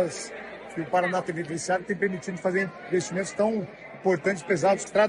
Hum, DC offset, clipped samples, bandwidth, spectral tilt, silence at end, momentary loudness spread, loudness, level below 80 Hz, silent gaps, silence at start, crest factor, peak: none; under 0.1%; under 0.1%; 11 kHz; -5 dB/octave; 0 s; 12 LU; -27 LUFS; -66 dBFS; none; 0 s; 18 dB; -8 dBFS